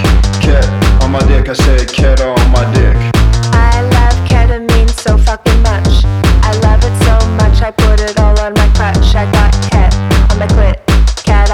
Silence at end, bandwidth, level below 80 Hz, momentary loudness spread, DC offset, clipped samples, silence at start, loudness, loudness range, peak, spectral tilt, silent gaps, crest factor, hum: 0 s; 12 kHz; -10 dBFS; 1 LU; under 0.1%; under 0.1%; 0 s; -10 LUFS; 0 LU; 0 dBFS; -6 dB/octave; none; 8 dB; none